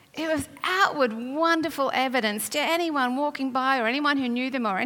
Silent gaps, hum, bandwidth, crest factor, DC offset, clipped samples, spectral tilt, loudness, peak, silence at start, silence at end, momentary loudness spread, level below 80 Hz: none; none; 18 kHz; 16 dB; under 0.1%; under 0.1%; -3 dB/octave; -25 LUFS; -8 dBFS; 0.15 s; 0 s; 5 LU; -68 dBFS